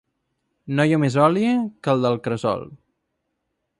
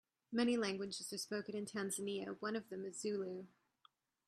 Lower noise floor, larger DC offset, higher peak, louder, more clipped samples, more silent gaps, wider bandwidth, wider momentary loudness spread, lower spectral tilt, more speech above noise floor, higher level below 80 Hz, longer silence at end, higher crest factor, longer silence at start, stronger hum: about the same, -76 dBFS vs -74 dBFS; neither; first, -4 dBFS vs -24 dBFS; first, -21 LUFS vs -42 LUFS; neither; neither; second, 11.5 kHz vs 13.5 kHz; about the same, 8 LU vs 10 LU; first, -7 dB/octave vs -4 dB/octave; first, 56 dB vs 33 dB; first, -60 dBFS vs -84 dBFS; first, 1.05 s vs 0.8 s; about the same, 20 dB vs 20 dB; first, 0.65 s vs 0.3 s; neither